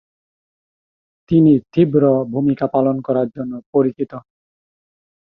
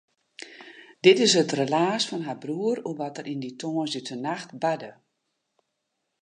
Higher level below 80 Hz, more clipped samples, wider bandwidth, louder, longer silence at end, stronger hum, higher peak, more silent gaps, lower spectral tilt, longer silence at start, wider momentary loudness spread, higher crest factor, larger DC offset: first, -54 dBFS vs -80 dBFS; neither; second, 5.4 kHz vs 10 kHz; first, -17 LUFS vs -25 LUFS; second, 1 s vs 1.3 s; neither; about the same, -2 dBFS vs -4 dBFS; first, 3.66-3.73 s vs none; first, -11.5 dB/octave vs -4 dB/octave; first, 1.3 s vs 0.4 s; second, 14 LU vs 23 LU; second, 16 dB vs 24 dB; neither